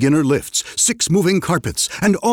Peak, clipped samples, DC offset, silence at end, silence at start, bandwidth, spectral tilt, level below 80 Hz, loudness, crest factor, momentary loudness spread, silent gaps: -6 dBFS; under 0.1%; under 0.1%; 0 s; 0 s; 19 kHz; -4 dB/octave; -46 dBFS; -17 LUFS; 12 dB; 5 LU; none